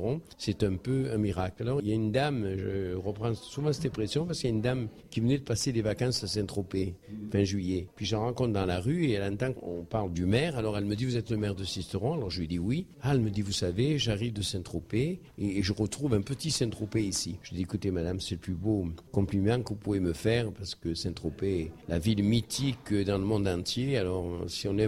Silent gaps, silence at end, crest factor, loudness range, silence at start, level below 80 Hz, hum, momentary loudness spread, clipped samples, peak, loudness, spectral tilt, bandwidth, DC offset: none; 0 s; 16 dB; 1 LU; 0 s; -50 dBFS; none; 6 LU; under 0.1%; -14 dBFS; -31 LUFS; -5.5 dB/octave; 15 kHz; under 0.1%